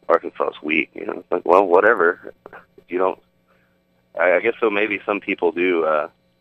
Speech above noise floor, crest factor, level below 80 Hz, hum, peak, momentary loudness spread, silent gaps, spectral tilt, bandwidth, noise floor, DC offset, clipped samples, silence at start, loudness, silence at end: 43 dB; 20 dB; -66 dBFS; none; 0 dBFS; 16 LU; none; -6.5 dB/octave; 6 kHz; -62 dBFS; under 0.1%; under 0.1%; 0.1 s; -19 LUFS; 0.35 s